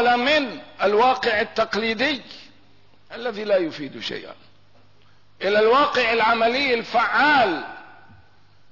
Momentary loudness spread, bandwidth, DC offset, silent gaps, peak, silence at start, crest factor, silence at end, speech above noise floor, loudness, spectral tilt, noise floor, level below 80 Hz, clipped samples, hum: 14 LU; 6 kHz; 0.3%; none; -8 dBFS; 0 s; 14 dB; 0.9 s; 37 dB; -20 LUFS; -4 dB/octave; -57 dBFS; -60 dBFS; under 0.1%; 50 Hz at -65 dBFS